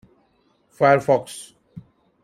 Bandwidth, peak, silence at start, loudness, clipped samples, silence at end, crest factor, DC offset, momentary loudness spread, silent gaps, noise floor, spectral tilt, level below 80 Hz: 15 kHz; -4 dBFS; 0.8 s; -19 LUFS; under 0.1%; 0.45 s; 20 dB; under 0.1%; 21 LU; none; -63 dBFS; -5.5 dB/octave; -64 dBFS